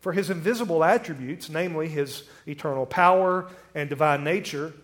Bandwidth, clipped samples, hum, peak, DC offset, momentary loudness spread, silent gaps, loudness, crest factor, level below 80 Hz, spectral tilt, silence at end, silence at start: 17.5 kHz; under 0.1%; none; -4 dBFS; under 0.1%; 14 LU; none; -25 LUFS; 20 dB; -66 dBFS; -5.5 dB/octave; 0.1 s; 0.05 s